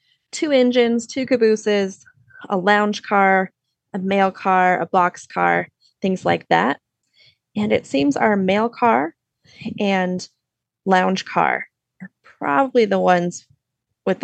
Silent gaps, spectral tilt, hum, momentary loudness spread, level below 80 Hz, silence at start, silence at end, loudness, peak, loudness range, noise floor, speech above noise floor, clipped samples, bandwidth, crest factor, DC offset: none; -5.5 dB/octave; none; 13 LU; -68 dBFS; 0.35 s; 0.1 s; -19 LUFS; -2 dBFS; 3 LU; -80 dBFS; 62 dB; under 0.1%; 9 kHz; 18 dB; under 0.1%